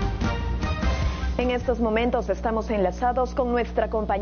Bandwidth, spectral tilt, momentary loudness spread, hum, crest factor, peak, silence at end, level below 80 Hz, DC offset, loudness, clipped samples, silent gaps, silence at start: 6.8 kHz; -5.5 dB/octave; 3 LU; 60 Hz at -35 dBFS; 14 dB; -10 dBFS; 0 s; -30 dBFS; under 0.1%; -25 LUFS; under 0.1%; none; 0 s